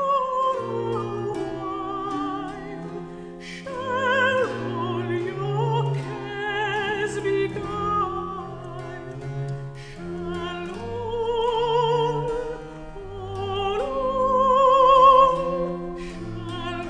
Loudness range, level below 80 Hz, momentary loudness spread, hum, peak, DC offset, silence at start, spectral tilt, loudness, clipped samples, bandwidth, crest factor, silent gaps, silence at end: 11 LU; -46 dBFS; 17 LU; none; -4 dBFS; under 0.1%; 0 s; -6 dB/octave; -23 LUFS; under 0.1%; 10.5 kHz; 20 dB; none; 0 s